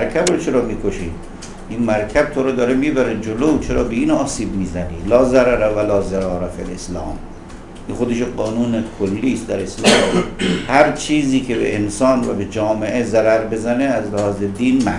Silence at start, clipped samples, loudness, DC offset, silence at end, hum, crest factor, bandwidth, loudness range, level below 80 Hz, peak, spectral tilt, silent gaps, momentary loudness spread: 0 s; under 0.1%; -17 LUFS; 0.2%; 0 s; none; 18 dB; 11.5 kHz; 5 LU; -34 dBFS; 0 dBFS; -5 dB/octave; none; 13 LU